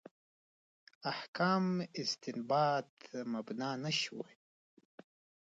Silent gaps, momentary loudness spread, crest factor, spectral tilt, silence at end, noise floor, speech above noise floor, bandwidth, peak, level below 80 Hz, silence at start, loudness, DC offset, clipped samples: 1.28-1.33 s, 2.89-2.97 s; 12 LU; 20 dB; -5 dB/octave; 1.2 s; under -90 dBFS; over 54 dB; 9 kHz; -20 dBFS; -86 dBFS; 1.05 s; -36 LUFS; under 0.1%; under 0.1%